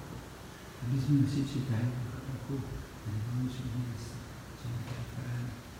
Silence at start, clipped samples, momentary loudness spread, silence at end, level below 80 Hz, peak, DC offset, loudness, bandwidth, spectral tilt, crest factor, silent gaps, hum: 0 s; under 0.1%; 16 LU; 0 s; -52 dBFS; -16 dBFS; under 0.1%; -36 LUFS; 16.5 kHz; -7 dB/octave; 18 dB; none; none